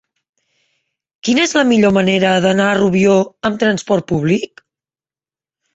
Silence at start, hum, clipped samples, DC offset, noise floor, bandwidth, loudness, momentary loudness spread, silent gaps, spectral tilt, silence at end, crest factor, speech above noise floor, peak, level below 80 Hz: 1.25 s; none; under 0.1%; under 0.1%; under -90 dBFS; 8.2 kHz; -14 LUFS; 6 LU; none; -5 dB/octave; 1.3 s; 14 dB; over 76 dB; -2 dBFS; -52 dBFS